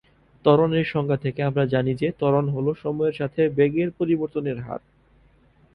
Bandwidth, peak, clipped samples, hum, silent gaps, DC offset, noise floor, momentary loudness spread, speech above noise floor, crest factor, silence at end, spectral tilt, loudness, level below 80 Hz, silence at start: 5.4 kHz; -4 dBFS; under 0.1%; none; none; under 0.1%; -57 dBFS; 8 LU; 35 dB; 20 dB; 0.95 s; -9.5 dB/octave; -23 LUFS; -56 dBFS; 0.45 s